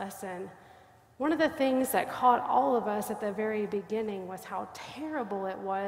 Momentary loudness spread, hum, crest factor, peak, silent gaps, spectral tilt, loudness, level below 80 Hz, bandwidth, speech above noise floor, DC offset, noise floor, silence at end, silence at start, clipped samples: 14 LU; none; 20 dB; -12 dBFS; none; -4.5 dB/octave; -30 LUFS; -68 dBFS; 16 kHz; 27 dB; under 0.1%; -57 dBFS; 0 s; 0 s; under 0.1%